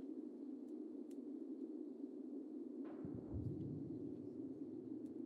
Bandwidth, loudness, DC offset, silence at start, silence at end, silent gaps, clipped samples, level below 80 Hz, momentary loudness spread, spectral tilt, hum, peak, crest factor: 9.6 kHz; -50 LUFS; under 0.1%; 0 s; 0 s; none; under 0.1%; -68 dBFS; 4 LU; -10.5 dB/octave; none; -36 dBFS; 14 dB